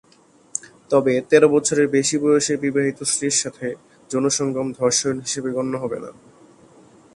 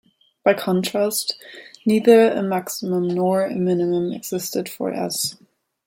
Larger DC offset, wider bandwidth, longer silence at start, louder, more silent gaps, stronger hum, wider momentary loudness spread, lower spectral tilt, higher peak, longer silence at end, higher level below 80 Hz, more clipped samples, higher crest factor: neither; second, 11.5 kHz vs 16.5 kHz; about the same, 0.55 s vs 0.45 s; about the same, -20 LUFS vs -20 LUFS; neither; neither; first, 15 LU vs 12 LU; second, -3.5 dB/octave vs -5 dB/octave; about the same, 0 dBFS vs -2 dBFS; first, 1.05 s vs 0.55 s; about the same, -62 dBFS vs -66 dBFS; neither; about the same, 20 dB vs 18 dB